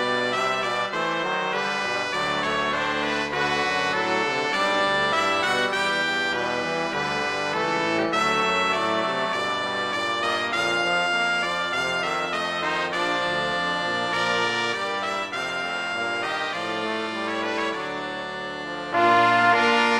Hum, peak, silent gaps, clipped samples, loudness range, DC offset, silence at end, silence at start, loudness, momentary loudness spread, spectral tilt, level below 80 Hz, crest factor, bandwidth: none; -4 dBFS; none; under 0.1%; 4 LU; under 0.1%; 0 s; 0 s; -23 LUFS; 6 LU; -3 dB/octave; -60 dBFS; 20 dB; 15 kHz